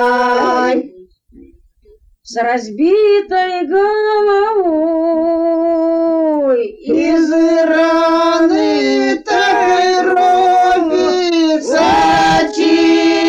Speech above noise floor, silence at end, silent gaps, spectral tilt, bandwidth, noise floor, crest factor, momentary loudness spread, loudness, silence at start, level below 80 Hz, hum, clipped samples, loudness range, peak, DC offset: 35 dB; 0 s; none; -4 dB/octave; 9.2 kHz; -48 dBFS; 10 dB; 5 LU; -12 LUFS; 0 s; -46 dBFS; none; under 0.1%; 4 LU; -2 dBFS; under 0.1%